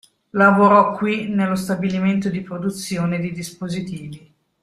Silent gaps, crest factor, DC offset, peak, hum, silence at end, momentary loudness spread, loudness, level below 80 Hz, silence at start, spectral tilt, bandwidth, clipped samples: none; 18 dB; under 0.1%; -2 dBFS; none; 0.45 s; 15 LU; -19 LUFS; -56 dBFS; 0.35 s; -6.5 dB/octave; 13.5 kHz; under 0.1%